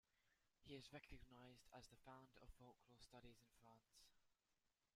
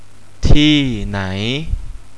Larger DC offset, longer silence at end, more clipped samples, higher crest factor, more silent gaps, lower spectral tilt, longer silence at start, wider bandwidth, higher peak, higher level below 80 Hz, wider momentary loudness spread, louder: second, under 0.1% vs 3%; about the same, 0.1 s vs 0.15 s; second, under 0.1% vs 0.5%; first, 20 dB vs 14 dB; neither; about the same, -4.5 dB/octave vs -5.5 dB/octave; second, 0.1 s vs 0.45 s; first, 15 kHz vs 9.8 kHz; second, -46 dBFS vs 0 dBFS; second, -76 dBFS vs -20 dBFS; second, 7 LU vs 13 LU; second, -65 LUFS vs -16 LUFS